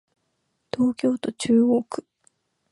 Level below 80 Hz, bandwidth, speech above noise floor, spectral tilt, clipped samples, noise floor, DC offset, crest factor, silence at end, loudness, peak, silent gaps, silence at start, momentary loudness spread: -64 dBFS; 11.5 kHz; 52 dB; -5.5 dB/octave; under 0.1%; -74 dBFS; under 0.1%; 16 dB; 0.7 s; -22 LUFS; -8 dBFS; none; 0.75 s; 16 LU